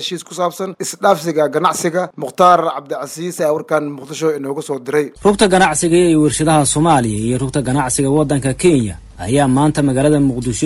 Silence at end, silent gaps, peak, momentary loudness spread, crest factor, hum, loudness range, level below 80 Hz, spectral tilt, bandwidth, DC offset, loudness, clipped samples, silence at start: 0 s; none; 0 dBFS; 11 LU; 14 dB; none; 3 LU; -40 dBFS; -5 dB/octave; 15.5 kHz; under 0.1%; -15 LUFS; under 0.1%; 0 s